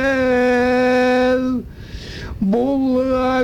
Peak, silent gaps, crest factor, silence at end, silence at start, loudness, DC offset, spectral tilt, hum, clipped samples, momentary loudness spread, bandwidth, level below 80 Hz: -8 dBFS; none; 10 dB; 0 s; 0 s; -17 LUFS; under 0.1%; -6.5 dB/octave; none; under 0.1%; 16 LU; 10.5 kHz; -38 dBFS